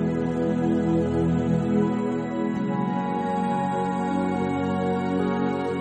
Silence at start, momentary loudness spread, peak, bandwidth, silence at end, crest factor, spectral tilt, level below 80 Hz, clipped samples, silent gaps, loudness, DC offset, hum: 0 s; 3 LU; -10 dBFS; 9 kHz; 0 s; 14 dB; -8.5 dB/octave; -48 dBFS; under 0.1%; none; -25 LUFS; under 0.1%; none